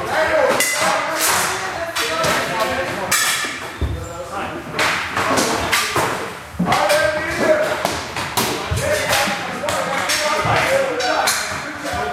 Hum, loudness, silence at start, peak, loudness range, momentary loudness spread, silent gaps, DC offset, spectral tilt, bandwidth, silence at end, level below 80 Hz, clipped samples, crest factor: none; -18 LUFS; 0 s; 0 dBFS; 2 LU; 9 LU; none; under 0.1%; -2.5 dB/octave; 16 kHz; 0 s; -40 dBFS; under 0.1%; 20 dB